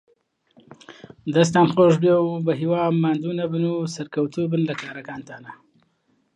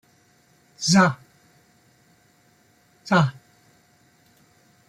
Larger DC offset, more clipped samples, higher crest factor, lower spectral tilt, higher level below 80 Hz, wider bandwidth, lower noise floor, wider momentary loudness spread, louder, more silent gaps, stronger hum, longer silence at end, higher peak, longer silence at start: neither; neither; about the same, 18 dB vs 22 dB; first, -6.5 dB/octave vs -4.5 dB/octave; about the same, -66 dBFS vs -64 dBFS; second, 10 kHz vs 12 kHz; first, -67 dBFS vs -60 dBFS; about the same, 19 LU vs 19 LU; about the same, -21 LUFS vs -20 LUFS; neither; neither; second, 0.8 s vs 1.55 s; about the same, -4 dBFS vs -6 dBFS; about the same, 0.9 s vs 0.8 s